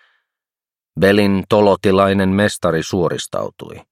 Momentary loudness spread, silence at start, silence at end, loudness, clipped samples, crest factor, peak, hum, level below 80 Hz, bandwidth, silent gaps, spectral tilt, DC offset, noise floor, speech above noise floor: 12 LU; 0.95 s; 0.1 s; -16 LUFS; under 0.1%; 16 dB; 0 dBFS; none; -50 dBFS; 15 kHz; none; -6 dB/octave; under 0.1%; under -90 dBFS; over 75 dB